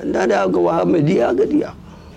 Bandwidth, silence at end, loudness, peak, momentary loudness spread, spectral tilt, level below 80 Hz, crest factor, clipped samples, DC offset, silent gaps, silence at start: 9.2 kHz; 0 s; -16 LUFS; -6 dBFS; 4 LU; -7.5 dB/octave; -46 dBFS; 10 dB; under 0.1%; under 0.1%; none; 0 s